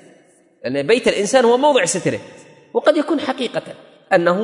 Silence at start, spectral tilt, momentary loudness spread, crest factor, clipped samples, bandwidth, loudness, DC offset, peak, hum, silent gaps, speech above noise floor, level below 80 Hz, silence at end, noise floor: 0.65 s; -4 dB/octave; 13 LU; 16 dB; under 0.1%; 11 kHz; -17 LUFS; under 0.1%; -2 dBFS; none; none; 36 dB; -62 dBFS; 0 s; -52 dBFS